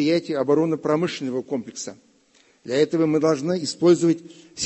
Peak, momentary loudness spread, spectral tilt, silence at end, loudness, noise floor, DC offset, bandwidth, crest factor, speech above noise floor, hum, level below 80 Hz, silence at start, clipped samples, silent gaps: -6 dBFS; 15 LU; -5.5 dB/octave; 0 s; -22 LUFS; -59 dBFS; under 0.1%; 8.6 kHz; 16 dB; 37 dB; none; -66 dBFS; 0 s; under 0.1%; none